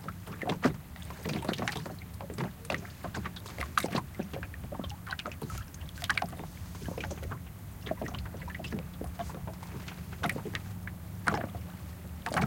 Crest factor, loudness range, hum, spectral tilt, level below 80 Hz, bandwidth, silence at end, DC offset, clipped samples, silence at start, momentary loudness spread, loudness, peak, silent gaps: 28 dB; 4 LU; none; -5 dB/octave; -50 dBFS; 17 kHz; 0 s; under 0.1%; under 0.1%; 0 s; 10 LU; -37 LUFS; -10 dBFS; none